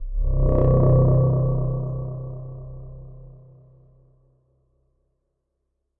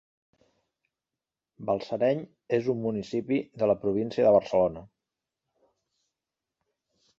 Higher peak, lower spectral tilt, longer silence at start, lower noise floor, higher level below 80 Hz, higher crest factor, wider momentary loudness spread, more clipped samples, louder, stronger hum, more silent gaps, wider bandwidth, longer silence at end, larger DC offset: first, -6 dBFS vs -10 dBFS; first, -15 dB/octave vs -7.5 dB/octave; second, 0 s vs 1.6 s; second, -76 dBFS vs -90 dBFS; first, -28 dBFS vs -64 dBFS; about the same, 16 dB vs 20 dB; first, 23 LU vs 10 LU; neither; first, -21 LUFS vs -27 LUFS; neither; neither; second, 2 kHz vs 7.6 kHz; first, 2.65 s vs 2.35 s; neither